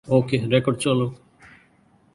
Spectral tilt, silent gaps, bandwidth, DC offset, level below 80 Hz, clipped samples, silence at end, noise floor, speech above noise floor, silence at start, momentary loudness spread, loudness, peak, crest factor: -6 dB/octave; none; 11.5 kHz; under 0.1%; -56 dBFS; under 0.1%; 1 s; -58 dBFS; 38 dB; 0.05 s; 4 LU; -22 LUFS; -4 dBFS; 20 dB